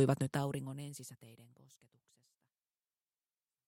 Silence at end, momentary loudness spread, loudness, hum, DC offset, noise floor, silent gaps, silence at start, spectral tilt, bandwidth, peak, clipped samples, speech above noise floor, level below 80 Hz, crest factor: 2.25 s; 23 LU; -39 LUFS; none; under 0.1%; under -90 dBFS; none; 0 s; -6.5 dB/octave; 16.5 kHz; -18 dBFS; under 0.1%; over 52 dB; -78 dBFS; 24 dB